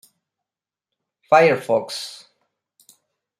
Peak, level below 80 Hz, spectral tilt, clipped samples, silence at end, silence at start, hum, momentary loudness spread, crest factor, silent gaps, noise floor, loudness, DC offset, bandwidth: -2 dBFS; -76 dBFS; -4.5 dB/octave; under 0.1%; 1.25 s; 1.3 s; none; 16 LU; 22 dB; none; -90 dBFS; -18 LUFS; under 0.1%; 15 kHz